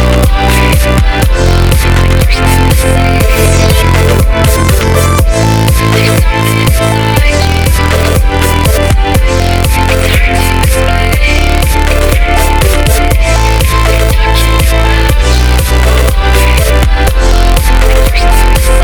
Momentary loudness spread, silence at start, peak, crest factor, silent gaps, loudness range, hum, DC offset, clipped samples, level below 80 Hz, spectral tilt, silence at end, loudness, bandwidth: 2 LU; 0 s; 0 dBFS; 6 dB; none; 1 LU; none; under 0.1%; 4%; -8 dBFS; -5 dB/octave; 0 s; -8 LUFS; 20 kHz